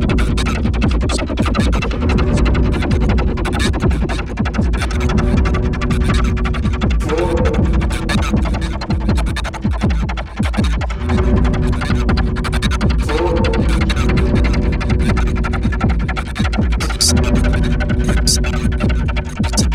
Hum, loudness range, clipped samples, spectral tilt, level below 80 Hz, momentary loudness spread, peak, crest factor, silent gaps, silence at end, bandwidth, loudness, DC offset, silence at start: none; 2 LU; under 0.1%; -5.5 dB/octave; -18 dBFS; 5 LU; -2 dBFS; 14 dB; none; 0 s; 13.5 kHz; -17 LUFS; under 0.1%; 0 s